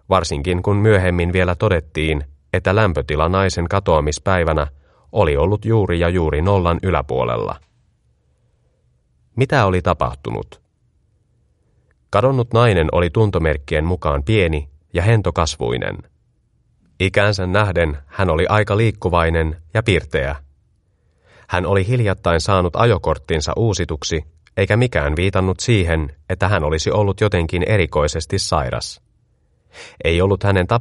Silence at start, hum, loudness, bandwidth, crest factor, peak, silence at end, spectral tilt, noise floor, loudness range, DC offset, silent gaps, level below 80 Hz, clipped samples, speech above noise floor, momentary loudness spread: 0.1 s; none; -18 LUFS; 11.5 kHz; 18 dB; 0 dBFS; 0 s; -6 dB/octave; -61 dBFS; 4 LU; under 0.1%; none; -32 dBFS; under 0.1%; 44 dB; 8 LU